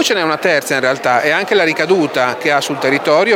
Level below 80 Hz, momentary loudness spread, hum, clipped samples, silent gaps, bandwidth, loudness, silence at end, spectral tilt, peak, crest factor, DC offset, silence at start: -66 dBFS; 3 LU; none; under 0.1%; none; 17 kHz; -14 LUFS; 0 s; -3.5 dB/octave; 0 dBFS; 14 dB; under 0.1%; 0 s